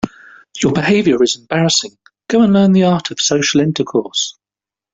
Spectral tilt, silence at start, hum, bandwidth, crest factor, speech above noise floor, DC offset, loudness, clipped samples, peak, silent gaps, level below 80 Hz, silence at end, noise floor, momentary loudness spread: -4.5 dB/octave; 0.05 s; none; 8 kHz; 12 dB; 75 dB; under 0.1%; -14 LUFS; under 0.1%; -2 dBFS; none; -52 dBFS; 0.6 s; -89 dBFS; 9 LU